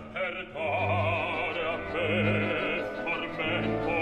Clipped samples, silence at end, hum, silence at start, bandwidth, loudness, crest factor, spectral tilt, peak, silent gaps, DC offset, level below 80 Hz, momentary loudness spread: under 0.1%; 0 s; none; 0 s; 9.2 kHz; -29 LUFS; 14 dB; -7 dB/octave; -16 dBFS; none; under 0.1%; -52 dBFS; 5 LU